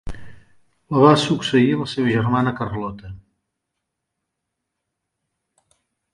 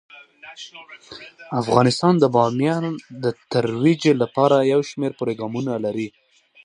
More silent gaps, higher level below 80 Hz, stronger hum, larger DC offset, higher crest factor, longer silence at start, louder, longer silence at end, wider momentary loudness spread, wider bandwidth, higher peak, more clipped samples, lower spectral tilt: neither; first, -46 dBFS vs -60 dBFS; neither; neither; about the same, 22 dB vs 20 dB; second, 0.05 s vs 0.45 s; about the same, -18 LUFS vs -20 LUFS; first, 2.95 s vs 0.55 s; about the same, 20 LU vs 21 LU; about the same, 11.5 kHz vs 11 kHz; about the same, 0 dBFS vs 0 dBFS; neither; about the same, -6.5 dB/octave vs -6.5 dB/octave